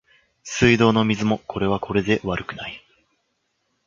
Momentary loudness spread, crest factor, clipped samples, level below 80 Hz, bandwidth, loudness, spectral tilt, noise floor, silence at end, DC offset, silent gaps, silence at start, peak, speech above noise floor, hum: 18 LU; 20 dB; under 0.1%; -46 dBFS; 7.6 kHz; -21 LUFS; -5.5 dB/octave; -72 dBFS; 1.1 s; under 0.1%; none; 0.45 s; -2 dBFS; 52 dB; none